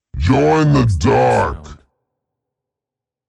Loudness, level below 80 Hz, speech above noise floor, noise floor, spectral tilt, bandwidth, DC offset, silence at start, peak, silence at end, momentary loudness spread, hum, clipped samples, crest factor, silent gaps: -14 LUFS; -32 dBFS; 73 dB; -86 dBFS; -7 dB/octave; 11 kHz; under 0.1%; 0.15 s; -2 dBFS; 1.55 s; 7 LU; none; under 0.1%; 14 dB; none